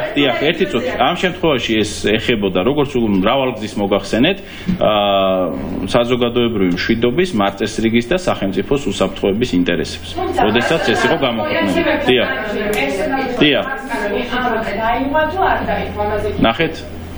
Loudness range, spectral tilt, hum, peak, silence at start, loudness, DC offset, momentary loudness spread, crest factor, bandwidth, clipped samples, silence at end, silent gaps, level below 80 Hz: 1 LU; -5 dB/octave; none; 0 dBFS; 0 s; -16 LUFS; under 0.1%; 6 LU; 16 dB; over 20 kHz; under 0.1%; 0 s; none; -34 dBFS